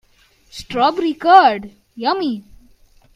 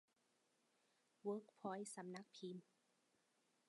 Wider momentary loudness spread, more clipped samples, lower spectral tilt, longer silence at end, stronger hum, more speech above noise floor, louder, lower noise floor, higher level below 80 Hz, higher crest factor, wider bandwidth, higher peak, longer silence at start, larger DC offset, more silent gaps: first, 24 LU vs 6 LU; neither; about the same, -4.5 dB/octave vs -5 dB/octave; second, 0.75 s vs 1.05 s; neither; first, 39 dB vs 32 dB; first, -15 LUFS vs -52 LUFS; second, -54 dBFS vs -84 dBFS; first, -52 dBFS vs under -90 dBFS; about the same, 18 dB vs 20 dB; about the same, 11.5 kHz vs 11 kHz; first, 0 dBFS vs -34 dBFS; second, 0.55 s vs 1.25 s; neither; neither